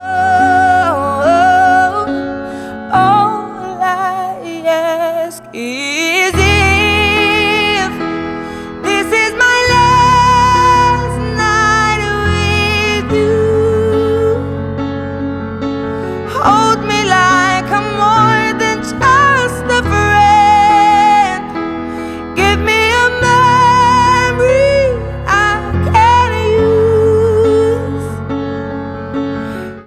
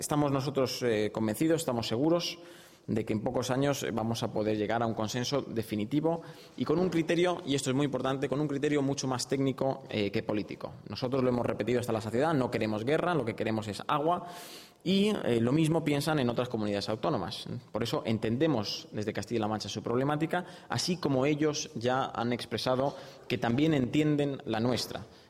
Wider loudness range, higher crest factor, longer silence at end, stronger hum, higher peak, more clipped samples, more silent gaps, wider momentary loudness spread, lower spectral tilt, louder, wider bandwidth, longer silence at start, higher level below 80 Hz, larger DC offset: first, 5 LU vs 2 LU; about the same, 12 dB vs 16 dB; about the same, 0.05 s vs 0.15 s; neither; first, 0 dBFS vs -14 dBFS; neither; neither; first, 12 LU vs 8 LU; about the same, -4.5 dB/octave vs -5.5 dB/octave; first, -11 LUFS vs -31 LUFS; about the same, 15 kHz vs 16 kHz; about the same, 0 s vs 0 s; first, -30 dBFS vs -62 dBFS; neither